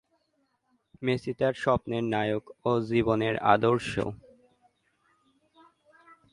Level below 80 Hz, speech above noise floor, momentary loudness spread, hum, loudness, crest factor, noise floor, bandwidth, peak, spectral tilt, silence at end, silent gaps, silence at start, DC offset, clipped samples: -58 dBFS; 47 dB; 9 LU; none; -27 LUFS; 24 dB; -74 dBFS; 11.5 kHz; -6 dBFS; -7 dB/octave; 2.15 s; none; 1 s; under 0.1%; under 0.1%